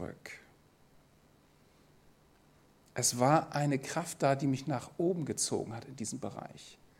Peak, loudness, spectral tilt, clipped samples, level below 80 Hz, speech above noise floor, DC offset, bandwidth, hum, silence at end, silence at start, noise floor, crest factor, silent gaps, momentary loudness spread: -12 dBFS; -33 LUFS; -4.5 dB/octave; under 0.1%; -70 dBFS; 31 dB; under 0.1%; 16.5 kHz; none; 0.25 s; 0 s; -65 dBFS; 24 dB; none; 20 LU